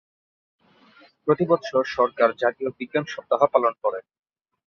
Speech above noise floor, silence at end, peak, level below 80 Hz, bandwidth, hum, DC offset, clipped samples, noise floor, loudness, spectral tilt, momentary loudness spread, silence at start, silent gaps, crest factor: 32 dB; 0.65 s; -4 dBFS; -68 dBFS; 6.8 kHz; none; under 0.1%; under 0.1%; -55 dBFS; -23 LUFS; -6.5 dB/octave; 8 LU; 1.25 s; none; 22 dB